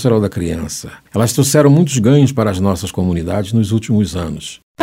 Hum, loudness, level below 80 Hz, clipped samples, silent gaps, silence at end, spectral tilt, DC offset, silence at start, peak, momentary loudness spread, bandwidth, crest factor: none; -15 LUFS; -38 dBFS; under 0.1%; 4.63-4.75 s; 0 s; -6 dB/octave; under 0.1%; 0 s; 0 dBFS; 13 LU; 16.5 kHz; 14 dB